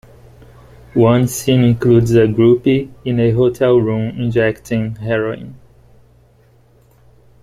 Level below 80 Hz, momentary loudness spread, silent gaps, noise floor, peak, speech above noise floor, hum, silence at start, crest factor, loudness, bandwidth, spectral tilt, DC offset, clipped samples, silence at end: -44 dBFS; 9 LU; none; -50 dBFS; 0 dBFS; 36 dB; 60 Hz at -35 dBFS; 0.95 s; 14 dB; -15 LUFS; 15.5 kHz; -7 dB/octave; under 0.1%; under 0.1%; 1.85 s